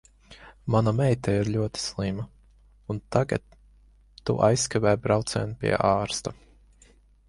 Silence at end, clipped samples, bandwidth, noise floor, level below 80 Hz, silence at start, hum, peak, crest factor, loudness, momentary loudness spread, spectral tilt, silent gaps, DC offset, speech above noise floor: 0.95 s; under 0.1%; 11.5 kHz; -57 dBFS; -50 dBFS; 0.3 s; none; -6 dBFS; 20 dB; -26 LUFS; 13 LU; -5.5 dB/octave; none; under 0.1%; 32 dB